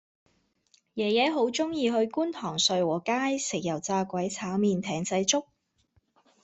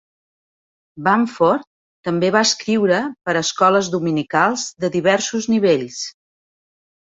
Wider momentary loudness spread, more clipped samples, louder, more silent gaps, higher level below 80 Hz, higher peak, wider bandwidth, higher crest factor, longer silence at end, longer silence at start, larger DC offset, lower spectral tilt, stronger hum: about the same, 6 LU vs 8 LU; neither; second, -27 LUFS vs -18 LUFS; second, none vs 1.67-2.03 s; second, -70 dBFS vs -62 dBFS; second, -8 dBFS vs -2 dBFS; about the same, 8.4 kHz vs 8 kHz; about the same, 20 dB vs 18 dB; about the same, 1 s vs 0.95 s; about the same, 0.95 s vs 0.95 s; neither; about the same, -3.5 dB/octave vs -4 dB/octave; neither